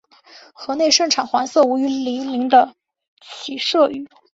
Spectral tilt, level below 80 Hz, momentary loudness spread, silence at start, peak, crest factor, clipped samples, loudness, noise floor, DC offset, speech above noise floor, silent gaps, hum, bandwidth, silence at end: -1.5 dB/octave; -66 dBFS; 16 LU; 0.35 s; -2 dBFS; 18 dB; under 0.1%; -17 LUFS; -47 dBFS; under 0.1%; 29 dB; 3.08-3.17 s; none; 8 kHz; 0.3 s